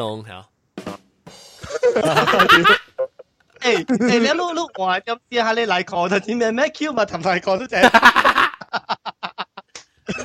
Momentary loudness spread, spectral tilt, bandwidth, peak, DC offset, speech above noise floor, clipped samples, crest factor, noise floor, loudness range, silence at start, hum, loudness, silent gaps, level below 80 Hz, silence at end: 20 LU; -4 dB/octave; 16 kHz; 0 dBFS; under 0.1%; 31 dB; under 0.1%; 18 dB; -49 dBFS; 4 LU; 0 s; none; -17 LUFS; none; -54 dBFS; 0 s